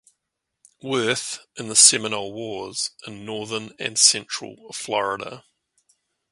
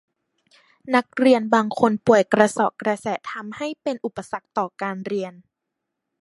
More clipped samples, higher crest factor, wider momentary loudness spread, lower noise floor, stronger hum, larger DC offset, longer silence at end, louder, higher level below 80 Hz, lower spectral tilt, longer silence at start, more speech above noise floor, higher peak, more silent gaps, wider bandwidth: neither; about the same, 24 dB vs 22 dB; first, 20 LU vs 13 LU; about the same, -81 dBFS vs -81 dBFS; neither; neither; about the same, 0.9 s vs 0.9 s; about the same, -20 LUFS vs -21 LUFS; about the same, -68 dBFS vs -66 dBFS; second, -0.5 dB/octave vs -5.5 dB/octave; about the same, 0.85 s vs 0.85 s; about the same, 57 dB vs 60 dB; about the same, 0 dBFS vs 0 dBFS; neither; first, 16 kHz vs 11.5 kHz